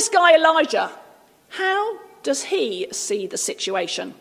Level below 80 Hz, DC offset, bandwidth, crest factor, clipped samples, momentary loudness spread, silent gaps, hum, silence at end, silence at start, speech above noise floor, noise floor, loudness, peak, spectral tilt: -76 dBFS; under 0.1%; 16 kHz; 18 dB; under 0.1%; 14 LU; none; none; 0.05 s; 0 s; 31 dB; -51 dBFS; -20 LUFS; -2 dBFS; -1 dB/octave